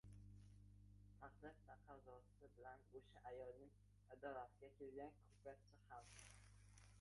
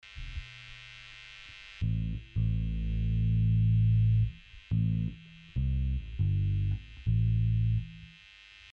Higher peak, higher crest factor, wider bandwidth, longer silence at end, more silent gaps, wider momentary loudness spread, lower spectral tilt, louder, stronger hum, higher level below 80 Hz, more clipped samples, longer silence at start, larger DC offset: second, -40 dBFS vs -18 dBFS; first, 22 dB vs 12 dB; first, 11.5 kHz vs 5 kHz; second, 0 s vs 0.65 s; neither; second, 11 LU vs 20 LU; second, -5.5 dB/octave vs -8.5 dB/octave; second, -62 LUFS vs -30 LUFS; first, 50 Hz at -70 dBFS vs none; second, -74 dBFS vs -38 dBFS; neither; about the same, 0.05 s vs 0.05 s; neither